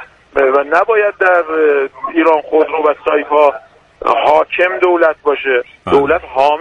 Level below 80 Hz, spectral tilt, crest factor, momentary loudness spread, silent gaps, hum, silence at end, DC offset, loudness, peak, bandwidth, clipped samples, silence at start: -48 dBFS; -5.5 dB/octave; 12 dB; 5 LU; none; none; 0 s; under 0.1%; -13 LUFS; 0 dBFS; 7.8 kHz; under 0.1%; 0 s